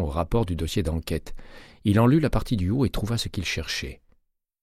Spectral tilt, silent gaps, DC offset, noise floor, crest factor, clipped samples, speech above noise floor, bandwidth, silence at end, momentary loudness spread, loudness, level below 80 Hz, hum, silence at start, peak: -6 dB/octave; none; under 0.1%; -66 dBFS; 18 dB; under 0.1%; 42 dB; 15.5 kHz; 0.65 s; 11 LU; -25 LUFS; -36 dBFS; none; 0 s; -8 dBFS